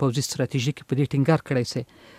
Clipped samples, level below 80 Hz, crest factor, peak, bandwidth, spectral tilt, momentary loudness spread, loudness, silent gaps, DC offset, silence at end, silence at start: under 0.1%; -60 dBFS; 18 dB; -6 dBFS; 15.5 kHz; -6 dB/octave; 6 LU; -25 LUFS; none; under 0.1%; 0.35 s; 0 s